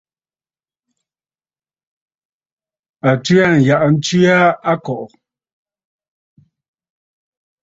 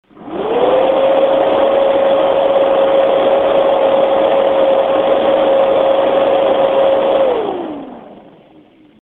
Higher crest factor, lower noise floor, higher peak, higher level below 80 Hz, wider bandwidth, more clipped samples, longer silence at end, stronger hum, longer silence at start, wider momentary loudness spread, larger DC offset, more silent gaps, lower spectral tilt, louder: first, 18 dB vs 12 dB; first, under -90 dBFS vs -45 dBFS; about the same, 0 dBFS vs 0 dBFS; second, -56 dBFS vs -50 dBFS; first, 7.8 kHz vs 4.1 kHz; neither; first, 2.6 s vs 0.9 s; neither; first, 3.05 s vs 0.2 s; first, 13 LU vs 7 LU; neither; neither; about the same, -6 dB/octave vs -7 dB/octave; about the same, -13 LUFS vs -12 LUFS